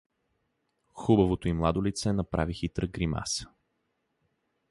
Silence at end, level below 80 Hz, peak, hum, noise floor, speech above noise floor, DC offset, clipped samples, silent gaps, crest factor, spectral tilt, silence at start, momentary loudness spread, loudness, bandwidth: 1.25 s; -44 dBFS; -10 dBFS; none; -78 dBFS; 50 dB; under 0.1%; under 0.1%; none; 20 dB; -6 dB/octave; 0.95 s; 9 LU; -29 LUFS; 11.5 kHz